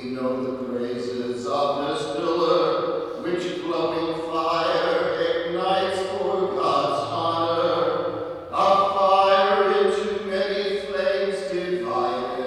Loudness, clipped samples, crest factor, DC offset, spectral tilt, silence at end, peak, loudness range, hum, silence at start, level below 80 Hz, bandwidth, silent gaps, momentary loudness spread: -23 LUFS; under 0.1%; 18 dB; under 0.1%; -5 dB/octave; 0 s; -6 dBFS; 4 LU; none; 0 s; -60 dBFS; 11.5 kHz; none; 9 LU